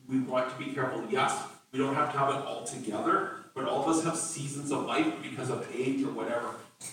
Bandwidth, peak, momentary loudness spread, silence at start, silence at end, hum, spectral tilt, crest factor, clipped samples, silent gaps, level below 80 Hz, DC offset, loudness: 16.5 kHz; -16 dBFS; 8 LU; 0.05 s; 0 s; none; -4.5 dB/octave; 16 dB; under 0.1%; none; -78 dBFS; under 0.1%; -31 LUFS